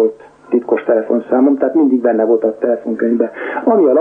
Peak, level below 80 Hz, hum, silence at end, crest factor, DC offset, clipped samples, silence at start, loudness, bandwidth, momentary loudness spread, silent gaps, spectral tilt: -2 dBFS; -66 dBFS; none; 0 s; 12 dB; under 0.1%; under 0.1%; 0 s; -14 LUFS; 3.6 kHz; 6 LU; none; -9 dB/octave